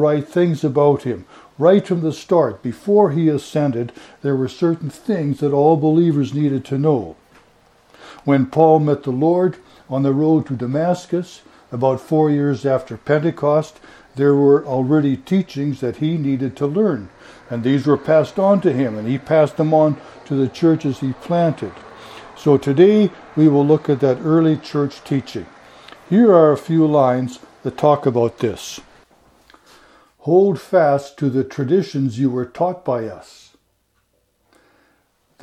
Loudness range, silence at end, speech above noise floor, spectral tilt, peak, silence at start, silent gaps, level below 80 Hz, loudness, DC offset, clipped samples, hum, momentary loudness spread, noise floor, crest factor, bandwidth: 4 LU; 2.25 s; 48 dB; -8 dB/octave; 0 dBFS; 0 s; none; -58 dBFS; -17 LUFS; under 0.1%; under 0.1%; none; 12 LU; -65 dBFS; 18 dB; 13 kHz